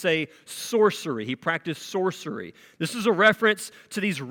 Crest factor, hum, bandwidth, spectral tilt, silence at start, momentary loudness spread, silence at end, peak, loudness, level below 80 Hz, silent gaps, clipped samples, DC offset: 20 dB; none; 18 kHz; -4 dB/octave; 0 s; 15 LU; 0 s; -4 dBFS; -25 LUFS; -74 dBFS; none; under 0.1%; under 0.1%